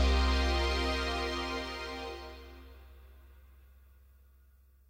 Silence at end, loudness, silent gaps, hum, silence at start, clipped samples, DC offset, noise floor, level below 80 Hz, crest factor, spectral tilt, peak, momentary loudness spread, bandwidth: 1.45 s; -33 LUFS; none; none; 0 s; under 0.1%; under 0.1%; -62 dBFS; -36 dBFS; 18 dB; -5 dB/octave; -16 dBFS; 23 LU; 15.5 kHz